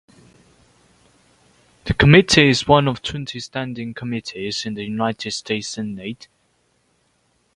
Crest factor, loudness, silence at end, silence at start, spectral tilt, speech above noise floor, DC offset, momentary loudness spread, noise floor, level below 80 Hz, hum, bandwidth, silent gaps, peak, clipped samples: 20 dB; -19 LUFS; 1.4 s; 1.85 s; -5 dB/octave; 45 dB; under 0.1%; 17 LU; -64 dBFS; -42 dBFS; none; 11 kHz; none; 0 dBFS; under 0.1%